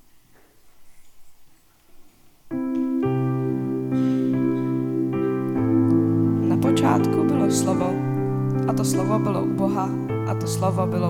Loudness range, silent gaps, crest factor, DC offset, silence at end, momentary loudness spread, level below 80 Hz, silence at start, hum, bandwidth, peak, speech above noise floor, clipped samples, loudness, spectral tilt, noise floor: 7 LU; none; 16 dB; under 0.1%; 0 s; 6 LU; -56 dBFS; 0.65 s; none; 16 kHz; -6 dBFS; 31 dB; under 0.1%; -22 LUFS; -7 dB/octave; -52 dBFS